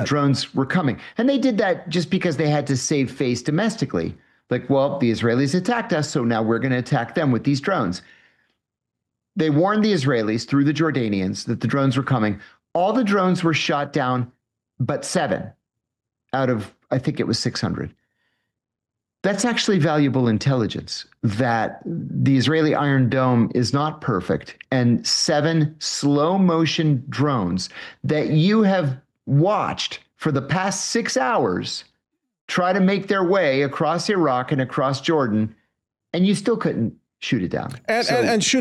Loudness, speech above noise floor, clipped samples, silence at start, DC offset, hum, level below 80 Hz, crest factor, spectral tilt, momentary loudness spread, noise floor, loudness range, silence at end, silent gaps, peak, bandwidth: -21 LUFS; 63 dB; under 0.1%; 0 s; under 0.1%; none; -60 dBFS; 12 dB; -5.5 dB/octave; 9 LU; -83 dBFS; 4 LU; 0 s; 32.41-32.48 s; -8 dBFS; 12 kHz